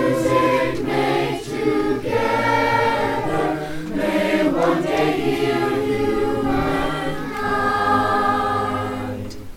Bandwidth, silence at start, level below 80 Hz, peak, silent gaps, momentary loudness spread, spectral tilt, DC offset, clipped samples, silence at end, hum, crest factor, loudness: 16.5 kHz; 0 s; -40 dBFS; -4 dBFS; none; 7 LU; -6 dB/octave; under 0.1%; under 0.1%; 0 s; none; 14 dB; -20 LUFS